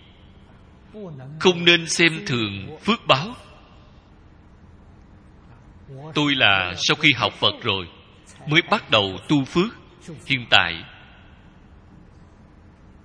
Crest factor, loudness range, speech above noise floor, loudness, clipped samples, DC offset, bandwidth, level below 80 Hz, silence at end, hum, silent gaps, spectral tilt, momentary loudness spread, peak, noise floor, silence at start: 24 dB; 7 LU; 28 dB; -19 LUFS; under 0.1%; under 0.1%; 10.5 kHz; -52 dBFS; 2.15 s; none; none; -3.5 dB/octave; 22 LU; 0 dBFS; -49 dBFS; 0.95 s